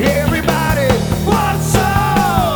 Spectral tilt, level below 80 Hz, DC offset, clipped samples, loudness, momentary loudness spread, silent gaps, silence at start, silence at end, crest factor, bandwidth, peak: -5.5 dB/octave; -26 dBFS; under 0.1%; under 0.1%; -14 LUFS; 2 LU; none; 0 s; 0 s; 14 dB; over 20 kHz; 0 dBFS